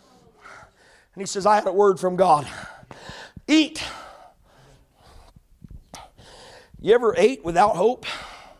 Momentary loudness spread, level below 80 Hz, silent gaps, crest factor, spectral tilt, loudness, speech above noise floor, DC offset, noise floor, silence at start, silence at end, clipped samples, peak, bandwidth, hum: 22 LU; -54 dBFS; none; 18 dB; -4.5 dB/octave; -20 LUFS; 36 dB; under 0.1%; -55 dBFS; 0.5 s; 0.2 s; under 0.1%; -6 dBFS; 13 kHz; none